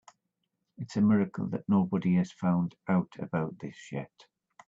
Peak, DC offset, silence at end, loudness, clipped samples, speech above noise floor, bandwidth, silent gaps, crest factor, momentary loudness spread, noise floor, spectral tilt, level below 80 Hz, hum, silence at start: -14 dBFS; under 0.1%; 0.6 s; -30 LUFS; under 0.1%; 53 dB; 7.6 kHz; none; 16 dB; 14 LU; -82 dBFS; -8.5 dB/octave; -68 dBFS; none; 0.8 s